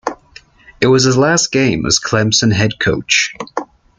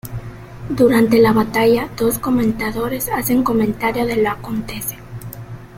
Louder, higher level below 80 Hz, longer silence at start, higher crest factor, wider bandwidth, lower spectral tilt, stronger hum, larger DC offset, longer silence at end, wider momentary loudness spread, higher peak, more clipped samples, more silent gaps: first, -13 LUFS vs -17 LUFS; about the same, -42 dBFS vs -40 dBFS; about the same, 0.05 s vs 0.05 s; about the same, 14 dB vs 16 dB; second, 10 kHz vs 16.5 kHz; second, -3.5 dB/octave vs -5.5 dB/octave; neither; neither; first, 0.35 s vs 0 s; second, 14 LU vs 20 LU; about the same, 0 dBFS vs -2 dBFS; neither; neither